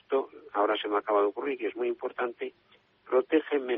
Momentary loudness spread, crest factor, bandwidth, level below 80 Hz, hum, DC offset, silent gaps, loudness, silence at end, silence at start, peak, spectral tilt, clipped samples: 8 LU; 18 dB; 3.9 kHz; -78 dBFS; none; under 0.1%; none; -29 LUFS; 0 s; 0.1 s; -12 dBFS; -1 dB/octave; under 0.1%